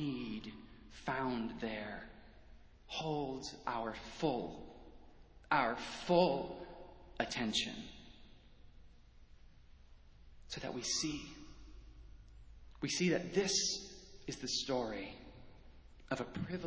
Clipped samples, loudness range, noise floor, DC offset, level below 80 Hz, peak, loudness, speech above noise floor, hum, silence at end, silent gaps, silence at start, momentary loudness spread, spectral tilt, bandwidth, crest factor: under 0.1%; 7 LU; -59 dBFS; under 0.1%; -60 dBFS; -18 dBFS; -38 LUFS; 22 dB; none; 0 s; none; 0 s; 23 LU; -3.5 dB/octave; 8 kHz; 24 dB